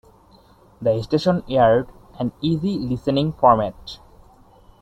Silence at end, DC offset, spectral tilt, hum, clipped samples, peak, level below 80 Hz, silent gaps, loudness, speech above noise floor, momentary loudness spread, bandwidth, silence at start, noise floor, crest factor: 0.85 s; under 0.1%; -8 dB/octave; none; under 0.1%; -2 dBFS; -46 dBFS; none; -20 LUFS; 32 dB; 17 LU; 11 kHz; 0.8 s; -52 dBFS; 20 dB